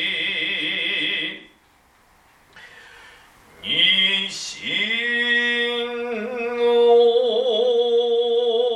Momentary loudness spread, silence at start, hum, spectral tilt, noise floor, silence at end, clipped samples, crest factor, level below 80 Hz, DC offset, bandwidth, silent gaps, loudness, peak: 12 LU; 0 s; none; -2 dB/octave; -57 dBFS; 0 s; under 0.1%; 16 dB; -64 dBFS; under 0.1%; 10.5 kHz; none; -19 LUFS; -4 dBFS